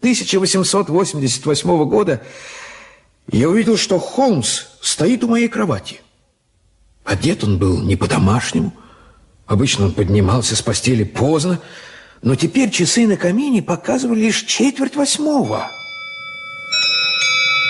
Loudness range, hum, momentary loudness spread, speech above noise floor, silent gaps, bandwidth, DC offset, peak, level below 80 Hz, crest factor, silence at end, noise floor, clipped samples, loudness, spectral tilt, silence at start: 3 LU; none; 13 LU; 44 dB; none; 11.5 kHz; under 0.1%; -4 dBFS; -38 dBFS; 12 dB; 0 s; -60 dBFS; under 0.1%; -16 LUFS; -4.5 dB/octave; 0 s